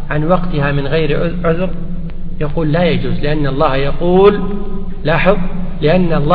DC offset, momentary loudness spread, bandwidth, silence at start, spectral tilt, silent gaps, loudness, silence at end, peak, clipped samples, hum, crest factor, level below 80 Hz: under 0.1%; 12 LU; 4.7 kHz; 0 s; -10.5 dB/octave; none; -15 LUFS; 0 s; 0 dBFS; under 0.1%; none; 12 dB; -20 dBFS